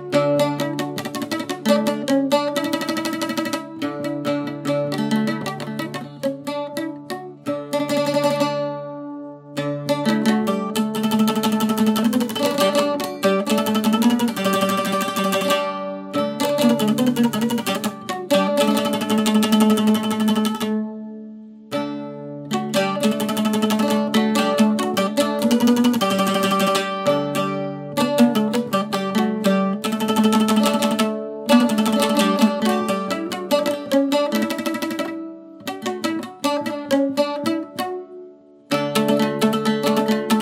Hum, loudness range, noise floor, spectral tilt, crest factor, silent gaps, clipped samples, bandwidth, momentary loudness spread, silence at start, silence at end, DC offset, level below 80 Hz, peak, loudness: none; 6 LU; -44 dBFS; -5 dB/octave; 18 dB; none; under 0.1%; 16.5 kHz; 10 LU; 0 s; 0 s; under 0.1%; -66 dBFS; -2 dBFS; -20 LUFS